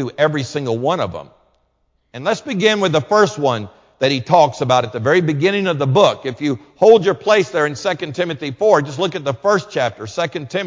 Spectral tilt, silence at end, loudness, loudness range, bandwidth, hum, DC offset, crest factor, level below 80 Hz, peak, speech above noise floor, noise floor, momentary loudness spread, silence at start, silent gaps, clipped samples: -5.5 dB/octave; 0 s; -17 LUFS; 4 LU; 7.6 kHz; none; under 0.1%; 16 dB; -56 dBFS; 0 dBFS; 48 dB; -64 dBFS; 9 LU; 0 s; none; under 0.1%